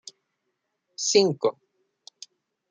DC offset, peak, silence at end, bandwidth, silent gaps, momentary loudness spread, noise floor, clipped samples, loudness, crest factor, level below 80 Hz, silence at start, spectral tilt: under 0.1%; -6 dBFS; 1.2 s; 9.6 kHz; none; 25 LU; -79 dBFS; under 0.1%; -23 LUFS; 22 dB; -80 dBFS; 1 s; -3 dB/octave